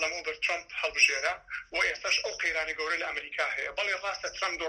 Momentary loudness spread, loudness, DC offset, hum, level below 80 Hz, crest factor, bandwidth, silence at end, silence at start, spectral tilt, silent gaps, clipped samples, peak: 9 LU; -29 LUFS; under 0.1%; none; -62 dBFS; 22 dB; 13.5 kHz; 0 s; 0 s; 0.5 dB/octave; none; under 0.1%; -8 dBFS